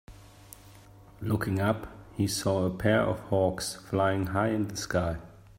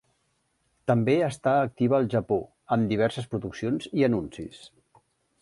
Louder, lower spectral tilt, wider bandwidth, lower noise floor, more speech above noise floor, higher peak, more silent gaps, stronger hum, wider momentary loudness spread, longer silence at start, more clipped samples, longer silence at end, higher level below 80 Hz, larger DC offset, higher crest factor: second, -29 LUFS vs -26 LUFS; second, -5.5 dB/octave vs -7.5 dB/octave; first, 16 kHz vs 11.5 kHz; second, -52 dBFS vs -72 dBFS; second, 24 dB vs 47 dB; about the same, -10 dBFS vs -8 dBFS; neither; neither; first, 16 LU vs 10 LU; second, 0.1 s vs 0.85 s; neither; second, 0.25 s vs 0.75 s; first, -52 dBFS vs -58 dBFS; neither; about the same, 20 dB vs 18 dB